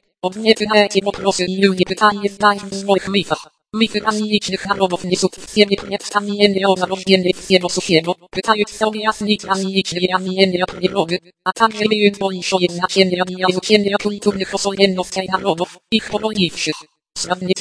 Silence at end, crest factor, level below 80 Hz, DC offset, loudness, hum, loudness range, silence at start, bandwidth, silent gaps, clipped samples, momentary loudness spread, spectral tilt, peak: 0 s; 18 dB; -52 dBFS; under 0.1%; -17 LUFS; none; 2 LU; 0.25 s; 11 kHz; none; under 0.1%; 7 LU; -4 dB/octave; 0 dBFS